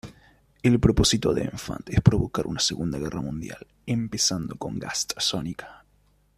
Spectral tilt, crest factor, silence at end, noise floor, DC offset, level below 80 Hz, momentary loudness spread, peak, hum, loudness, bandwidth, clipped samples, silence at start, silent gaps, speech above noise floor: -4.5 dB/octave; 24 dB; 0.6 s; -63 dBFS; under 0.1%; -40 dBFS; 14 LU; -2 dBFS; none; -25 LUFS; 15 kHz; under 0.1%; 0.05 s; none; 38 dB